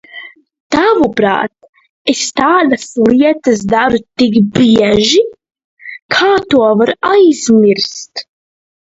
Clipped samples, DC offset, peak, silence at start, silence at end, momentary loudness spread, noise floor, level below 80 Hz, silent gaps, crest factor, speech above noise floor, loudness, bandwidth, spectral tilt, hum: under 0.1%; under 0.1%; 0 dBFS; 0.15 s; 0.7 s; 12 LU; -34 dBFS; -46 dBFS; 0.60-0.70 s, 1.69-1.73 s, 1.89-2.05 s, 5.64-5.77 s, 6.02-6.09 s; 12 dB; 23 dB; -11 LUFS; 8 kHz; -4.5 dB/octave; none